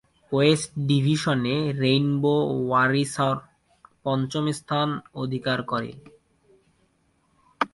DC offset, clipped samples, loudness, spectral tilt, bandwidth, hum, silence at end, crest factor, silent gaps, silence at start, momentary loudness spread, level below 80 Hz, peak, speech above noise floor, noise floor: under 0.1%; under 0.1%; -24 LUFS; -6 dB/octave; 11.5 kHz; none; 0.05 s; 18 dB; none; 0.3 s; 9 LU; -60 dBFS; -6 dBFS; 43 dB; -67 dBFS